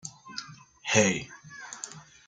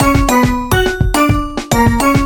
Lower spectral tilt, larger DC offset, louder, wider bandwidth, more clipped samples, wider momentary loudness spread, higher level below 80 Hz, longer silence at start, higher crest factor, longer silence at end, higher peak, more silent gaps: second, -3 dB/octave vs -5 dB/octave; neither; second, -27 LUFS vs -13 LUFS; second, 10 kHz vs 19.5 kHz; neither; first, 21 LU vs 4 LU; second, -66 dBFS vs -20 dBFS; about the same, 0.05 s vs 0 s; first, 24 dB vs 12 dB; first, 0.25 s vs 0 s; second, -8 dBFS vs 0 dBFS; neither